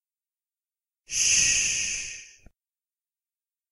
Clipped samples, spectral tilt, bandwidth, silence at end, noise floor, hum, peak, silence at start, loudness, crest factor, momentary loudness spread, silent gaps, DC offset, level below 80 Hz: under 0.1%; 2 dB/octave; 15 kHz; 1.4 s; under -90 dBFS; none; -8 dBFS; 1.1 s; -22 LUFS; 22 dB; 16 LU; none; under 0.1%; -56 dBFS